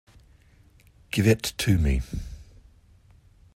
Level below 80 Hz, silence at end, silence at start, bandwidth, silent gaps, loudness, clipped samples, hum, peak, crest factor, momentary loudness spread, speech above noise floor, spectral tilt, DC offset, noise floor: -36 dBFS; 1.1 s; 1.15 s; 16 kHz; none; -25 LUFS; under 0.1%; none; -8 dBFS; 20 dB; 18 LU; 33 dB; -5.5 dB/octave; under 0.1%; -56 dBFS